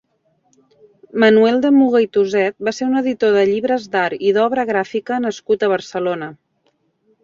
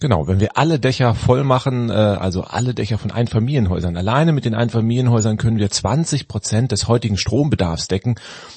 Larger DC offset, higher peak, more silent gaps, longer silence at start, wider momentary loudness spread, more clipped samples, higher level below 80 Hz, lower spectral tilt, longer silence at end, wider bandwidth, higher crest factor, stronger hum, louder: neither; about the same, -2 dBFS vs 0 dBFS; neither; first, 1.15 s vs 0 s; first, 9 LU vs 5 LU; neither; second, -62 dBFS vs -42 dBFS; about the same, -5.5 dB/octave vs -6 dB/octave; first, 0.9 s vs 0 s; second, 7.6 kHz vs 8.8 kHz; about the same, 16 dB vs 16 dB; neither; about the same, -16 LUFS vs -18 LUFS